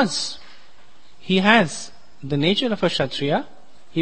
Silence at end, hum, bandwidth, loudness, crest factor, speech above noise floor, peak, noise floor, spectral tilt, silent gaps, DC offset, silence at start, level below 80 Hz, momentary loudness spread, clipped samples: 0 s; none; 8.8 kHz; -20 LUFS; 22 dB; 34 dB; 0 dBFS; -54 dBFS; -4.5 dB/octave; none; 2%; 0 s; -56 dBFS; 23 LU; under 0.1%